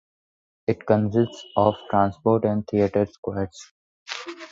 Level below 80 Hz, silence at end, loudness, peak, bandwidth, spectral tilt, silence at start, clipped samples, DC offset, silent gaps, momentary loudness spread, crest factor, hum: -52 dBFS; 0.05 s; -24 LUFS; -4 dBFS; 7.8 kHz; -7.5 dB/octave; 0.7 s; under 0.1%; under 0.1%; 3.18-3.23 s, 3.71-4.06 s; 12 LU; 20 dB; none